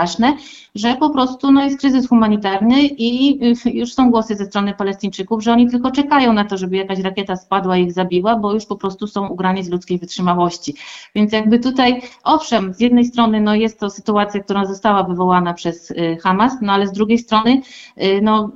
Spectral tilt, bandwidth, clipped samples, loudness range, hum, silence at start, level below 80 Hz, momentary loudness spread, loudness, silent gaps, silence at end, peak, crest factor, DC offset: -6 dB/octave; 7.8 kHz; under 0.1%; 4 LU; none; 0 s; -50 dBFS; 9 LU; -16 LUFS; none; 0.05 s; -2 dBFS; 14 dB; under 0.1%